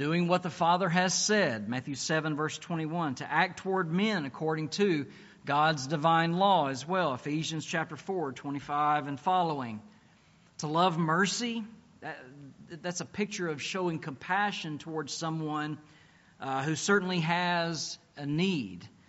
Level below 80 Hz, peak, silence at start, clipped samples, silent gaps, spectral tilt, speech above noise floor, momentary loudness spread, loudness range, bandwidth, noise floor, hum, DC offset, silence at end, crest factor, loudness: -72 dBFS; -12 dBFS; 0 s; under 0.1%; none; -4 dB/octave; 31 dB; 14 LU; 5 LU; 8 kHz; -62 dBFS; none; under 0.1%; 0.2 s; 20 dB; -30 LUFS